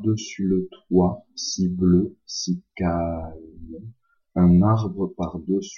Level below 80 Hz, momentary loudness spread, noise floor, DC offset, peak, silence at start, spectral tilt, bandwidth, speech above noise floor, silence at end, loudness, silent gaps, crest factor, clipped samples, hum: -48 dBFS; 20 LU; -45 dBFS; under 0.1%; -8 dBFS; 0 s; -6.5 dB/octave; 7.2 kHz; 24 dB; 0 s; -23 LUFS; none; 16 dB; under 0.1%; none